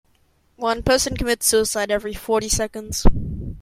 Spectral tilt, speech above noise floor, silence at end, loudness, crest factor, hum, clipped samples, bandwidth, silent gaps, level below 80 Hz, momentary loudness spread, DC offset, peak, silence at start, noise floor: -3.5 dB/octave; 42 dB; 0 s; -21 LUFS; 18 dB; none; under 0.1%; 16 kHz; none; -28 dBFS; 8 LU; under 0.1%; -2 dBFS; 0.6 s; -61 dBFS